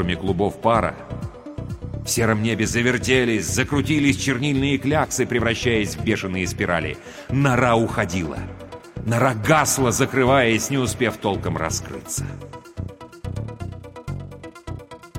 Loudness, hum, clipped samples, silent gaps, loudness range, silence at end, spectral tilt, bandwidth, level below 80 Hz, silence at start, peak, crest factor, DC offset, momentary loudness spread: -21 LUFS; none; under 0.1%; none; 7 LU; 0 s; -4.5 dB/octave; 16 kHz; -42 dBFS; 0 s; -4 dBFS; 18 dB; under 0.1%; 17 LU